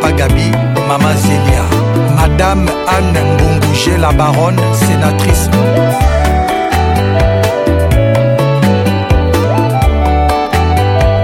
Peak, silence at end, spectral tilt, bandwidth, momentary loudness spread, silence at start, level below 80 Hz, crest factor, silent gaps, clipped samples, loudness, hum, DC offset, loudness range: 0 dBFS; 0 s; -6 dB/octave; 16.5 kHz; 2 LU; 0 s; -18 dBFS; 10 dB; none; under 0.1%; -11 LUFS; none; under 0.1%; 1 LU